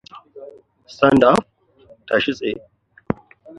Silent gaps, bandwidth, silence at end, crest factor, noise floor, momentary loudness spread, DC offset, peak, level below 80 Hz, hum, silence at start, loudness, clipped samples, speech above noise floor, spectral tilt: none; 11.5 kHz; 0.45 s; 20 dB; -51 dBFS; 25 LU; under 0.1%; 0 dBFS; -52 dBFS; none; 0.15 s; -18 LUFS; under 0.1%; 35 dB; -6 dB/octave